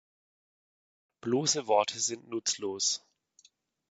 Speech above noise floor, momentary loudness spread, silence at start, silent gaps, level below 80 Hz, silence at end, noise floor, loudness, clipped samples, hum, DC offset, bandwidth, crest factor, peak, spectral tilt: 35 dB; 6 LU; 1.25 s; none; -78 dBFS; 0.9 s; -65 dBFS; -30 LUFS; under 0.1%; none; under 0.1%; 9.2 kHz; 22 dB; -12 dBFS; -2.5 dB/octave